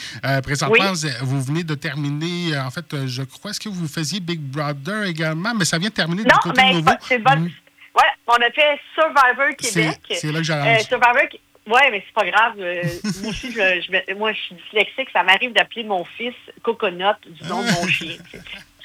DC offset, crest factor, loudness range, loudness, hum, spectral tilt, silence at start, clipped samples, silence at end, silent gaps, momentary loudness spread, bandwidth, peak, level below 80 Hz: under 0.1%; 20 dB; 8 LU; -19 LUFS; none; -4 dB/octave; 0 s; under 0.1%; 0 s; none; 12 LU; over 20 kHz; 0 dBFS; -54 dBFS